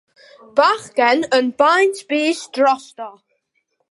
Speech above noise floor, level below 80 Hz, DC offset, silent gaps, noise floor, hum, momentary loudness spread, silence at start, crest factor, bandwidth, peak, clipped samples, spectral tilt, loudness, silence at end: 52 dB; -70 dBFS; under 0.1%; none; -69 dBFS; none; 12 LU; 0.55 s; 18 dB; 11.5 kHz; 0 dBFS; under 0.1%; -2.5 dB/octave; -17 LUFS; 0.8 s